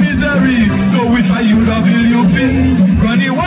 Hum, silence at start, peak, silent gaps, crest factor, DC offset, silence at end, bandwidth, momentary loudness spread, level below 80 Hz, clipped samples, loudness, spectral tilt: none; 0 s; -2 dBFS; none; 8 dB; under 0.1%; 0 s; 4 kHz; 1 LU; -26 dBFS; under 0.1%; -11 LUFS; -11 dB/octave